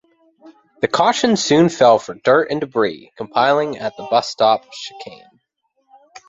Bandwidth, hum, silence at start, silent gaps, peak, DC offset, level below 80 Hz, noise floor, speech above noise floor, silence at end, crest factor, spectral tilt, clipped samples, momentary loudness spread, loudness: 8 kHz; none; 0.45 s; none; 0 dBFS; under 0.1%; -60 dBFS; -68 dBFS; 52 dB; 0.1 s; 18 dB; -4.5 dB/octave; under 0.1%; 18 LU; -16 LUFS